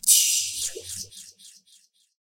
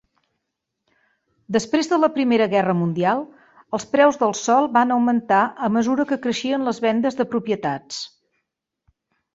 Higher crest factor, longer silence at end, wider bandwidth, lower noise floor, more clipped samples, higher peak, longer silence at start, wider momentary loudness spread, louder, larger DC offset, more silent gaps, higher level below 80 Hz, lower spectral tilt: first, 24 dB vs 18 dB; second, 0.75 s vs 1.3 s; first, 17 kHz vs 8 kHz; second, -60 dBFS vs -79 dBFS; neither; about the same, -4 dBFS vs -2 dBFS; second, 0.05 s vs 1.5 s; first, 26 LU vs 10 LU; about the same, -22 LUFS vs -20 LUFS; neither; neither; about the same, -66 dBFS vs -64 dBFS; second, 2.5 dB/octave vs -5 dB/octave